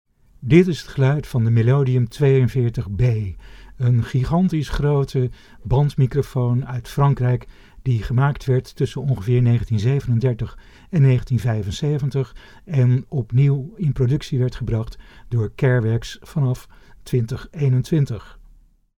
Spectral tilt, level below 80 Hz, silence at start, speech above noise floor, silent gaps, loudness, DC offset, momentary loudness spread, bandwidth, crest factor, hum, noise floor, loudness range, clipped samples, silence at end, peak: -8 dB/octave; -38 dBFS; 0.4 s; 31 dB; none; -20 LUFS; under 0.1%; 9 LU; 11 kHz; 20 dB; none; -50 dBFS; 3 LU; under 0.1%; 0.7 s; 0 dBFS